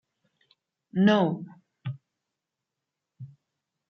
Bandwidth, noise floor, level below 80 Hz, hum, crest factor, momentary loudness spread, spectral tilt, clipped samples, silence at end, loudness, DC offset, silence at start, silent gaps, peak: 6.6 kHz; -86 dBFS; -76 dBFS; none; 22 dB; 26 LU; -8 dB/octave; under 0.1%; 0.65 s; -25 LUFS; under 0.1%; 0.95 s; none; -10 dBFS